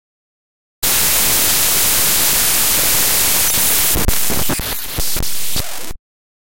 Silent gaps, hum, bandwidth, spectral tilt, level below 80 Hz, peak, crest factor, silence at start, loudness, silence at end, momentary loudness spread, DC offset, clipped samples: none; none; 17.5 kHz; -1 dB/octave; -30 dBFS; -2 dBFS; 14 dB; 0.8 s; -13 LUFS; 0.55 s; 9 LU; under 0.1%; under 0.1%